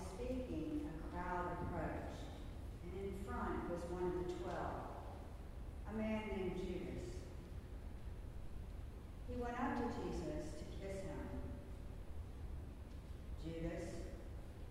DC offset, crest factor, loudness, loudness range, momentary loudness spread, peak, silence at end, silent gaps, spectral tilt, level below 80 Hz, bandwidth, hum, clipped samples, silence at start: under 0.1%; 16 dB; -47 LUFS; 5 LU; 11 LU; -28 dBFS; 0 s; none; -7 dB/octave; -52 dBFS; 16 kHz; none; under 0.1%; 0 s